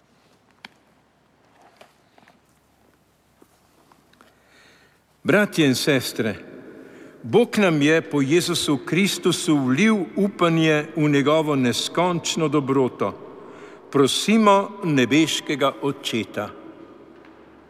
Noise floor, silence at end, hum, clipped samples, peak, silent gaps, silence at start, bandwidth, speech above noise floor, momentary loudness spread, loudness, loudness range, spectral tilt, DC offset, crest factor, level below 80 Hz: -60 dBFS; 0.75 s; none; under 0.1%; -4 dBFS; none; 5.25 s; 15.5 kHz; 41 dB; 12 LU; -20 LUFS; 4 LU; -4.5 dB/octave; under 0.1%; 18 dB; -66 dBFS